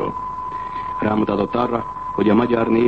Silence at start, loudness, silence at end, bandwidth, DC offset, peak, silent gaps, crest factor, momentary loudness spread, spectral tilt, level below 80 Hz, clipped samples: 0 s; -21 LUFS; 0 s; 6.4 kHz; 0.4%; -4 dBFS; none; 14 dB; 10 LU; -9 dB/octave; -46 dBFS; under 0.1%